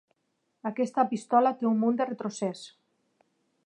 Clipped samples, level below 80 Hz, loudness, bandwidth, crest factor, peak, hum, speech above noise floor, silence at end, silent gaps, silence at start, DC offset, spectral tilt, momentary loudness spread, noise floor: under 0.1%; -86 dBFS; -28 LUFS; 10.5 kHz; 20 dB; -10 dBFS; none; 50 dB; 0.95 s; none; 0.65 s; under 0.1%; -6 dB/octave; 13 LU; -77 dBFS